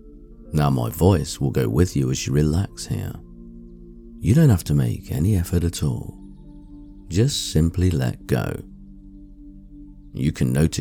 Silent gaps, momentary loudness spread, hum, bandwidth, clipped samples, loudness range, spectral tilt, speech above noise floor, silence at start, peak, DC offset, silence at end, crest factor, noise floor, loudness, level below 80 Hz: none; 17 LU; none; 18.5 kHz; under 0.1%; 3 LU; -6.5 dB/octave; 22 dB; 0.05 s; -4 dBFS; under 0.1%; 0 s; 18 dB; -42 dBFS; -21 LUFS; -36 dBFS